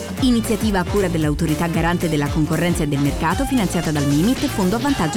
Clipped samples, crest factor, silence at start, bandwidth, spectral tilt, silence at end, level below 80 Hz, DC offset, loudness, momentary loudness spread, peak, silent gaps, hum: under 0.1%; 12 dB; 0 s; over 20 kHz; -5.5 dB/octave; 0 s; -32 dBFS; under 0.1%; -19 LUFS; 2 LU; -8 dBFS; none; none